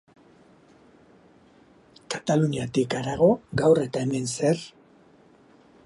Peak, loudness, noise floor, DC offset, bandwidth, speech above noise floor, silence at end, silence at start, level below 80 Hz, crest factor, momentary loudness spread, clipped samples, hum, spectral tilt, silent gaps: -6 dBFS; -24 LUFS; -56 dBFS; under 0.1%; 11.5 kHz; 33 dB; 1.15 s; 2.1 s; -58 dBFS; 20 dB; 9 LU; under 0.1%; none; -6 dB/octave; none